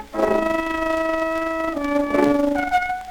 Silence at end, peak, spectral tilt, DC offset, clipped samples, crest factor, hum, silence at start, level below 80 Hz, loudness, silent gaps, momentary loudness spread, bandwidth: 0 s; -4 dBFS; -5.5 dB/octave; under 0.1%; under 0.1%; 16 dB; none; 0 s; -44 dBFS; -21 LUFS; none; 4 LU; 19.5 kHz